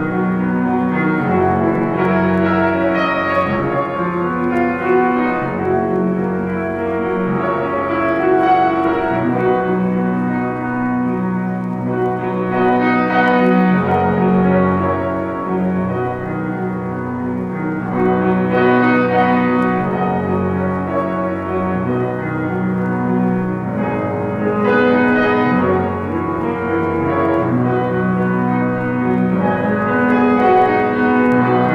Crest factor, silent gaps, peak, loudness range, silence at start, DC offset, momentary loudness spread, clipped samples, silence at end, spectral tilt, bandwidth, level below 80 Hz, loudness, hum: 14 dB; none; -2 dBFS; 4 LU; 0 s; under 0.1%; 7 LU; under 0.1%; 0 s; -9 dB/octave; 5.6 kHz; -46 dBFS; -16 LUFS; none